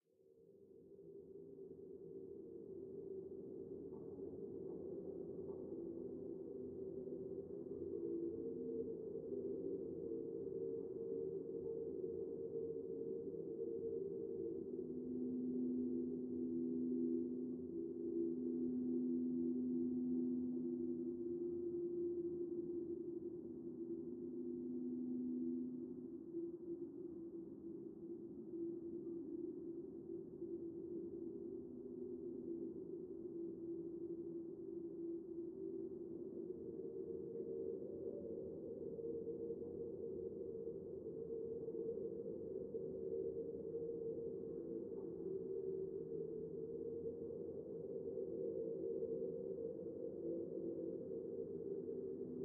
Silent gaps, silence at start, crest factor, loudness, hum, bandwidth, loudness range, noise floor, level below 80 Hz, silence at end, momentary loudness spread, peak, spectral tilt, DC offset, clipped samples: none; 0.2 s; 16 dB; -47 LUFS; none; 1.6 kHz; 7 LU; -69 dBFS; -80 dBFS; 0 s; 9 LU; -30 dBFS; -8 dB/octave; under 0.1%; under 0.1%